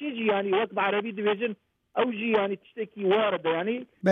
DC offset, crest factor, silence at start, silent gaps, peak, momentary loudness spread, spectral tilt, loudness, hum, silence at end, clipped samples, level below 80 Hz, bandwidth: under 0.1%; 16 dB; 0 s; none; -10 dBFS; 9 LU; -7 dB/octave; -27 LUFS; none; 0 s; under 0.1%; -78 dBFS; 4 kHz